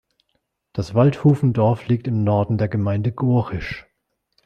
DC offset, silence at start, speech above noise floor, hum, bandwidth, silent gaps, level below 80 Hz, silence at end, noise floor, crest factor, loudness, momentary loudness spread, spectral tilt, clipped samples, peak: under 0.1%; 0.75 s; 55 dB; none; 7.2 kHz; none; -48 dBFS; 0.65 s; -73 dBFS; 18 dB; -20 LUFS; 13 LU; -9.5 dB/octave; under 0.1%; -2 dBFS